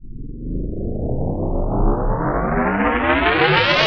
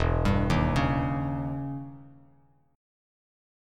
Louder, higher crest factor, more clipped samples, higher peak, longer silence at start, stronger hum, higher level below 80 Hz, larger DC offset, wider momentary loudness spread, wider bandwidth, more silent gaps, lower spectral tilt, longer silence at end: first, -19 LUFS vs -28 LUFS; about the same, 16 dB vs 18 dB; neither; first, -2 dBFS vs -12 dBFS; about the same, 0 s vs 0 s; neither; first, -24 dBFS vs -38 dBFS; first, 0.5% vs under 0.1%; about the same, 13 LU vs 12 LU; second, 6.6 kHz vs 12.5 kHz; neither; about the same, -6.5 dB/octave vs -7.5 dB/octave; second, 0 s vs 1.65 s